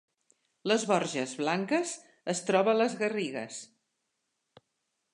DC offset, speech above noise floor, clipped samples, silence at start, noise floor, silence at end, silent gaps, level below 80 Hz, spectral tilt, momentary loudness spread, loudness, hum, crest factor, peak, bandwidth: under 0.1%; 52 dB; under 0.1%; 0.65 s; -81 dBFS; 1.5 s; none; -84 dBFS; -4 dB/octave; 13 LU; -30 LUFS; none; 22 dB; -10 dBFS; 11 kHz